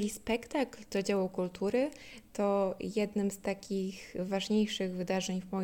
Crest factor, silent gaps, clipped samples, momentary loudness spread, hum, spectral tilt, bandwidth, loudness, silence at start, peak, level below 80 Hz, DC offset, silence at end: 16 dB; none; under 0.1%; 6 LU; none; -5 dB/octave; 17 kHz; -34 LUFS; 0 s; -18 dBFS; -62 dBFS; under 0.1%; 0 s